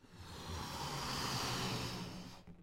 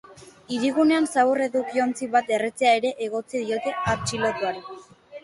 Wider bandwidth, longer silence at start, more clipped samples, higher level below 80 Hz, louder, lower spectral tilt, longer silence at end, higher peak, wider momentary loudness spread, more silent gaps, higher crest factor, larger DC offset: first, 16 kHz vs 11.5 kHz; about the same, 0 s vs 0.1 s; neither; about the same, -56 dBFS vs -56 dBFS; second, -41 LUFS vs -23 LUFS; about the same, -3.5 dB/octave vs -4.5 dB/octave; about the same, 0 s vs 0.05 s; second, -28 dBFS vs -8 dBFS; first, 13 LU vs 9 LU; neither; about the same, 16 dB vs 16 dB; neither